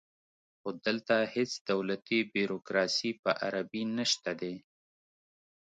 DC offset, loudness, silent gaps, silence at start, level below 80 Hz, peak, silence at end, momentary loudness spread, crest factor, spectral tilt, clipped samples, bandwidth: under 0.1%; -32 LUFS; 1.61-1.65 s, 3.19-3.23 s; 0.65 s; -78 dBFS; -14 dBFS; 1.05 s; 9 LU; 20 dB; -3.5 dB/octave; under 0.1%; 9.4 kHz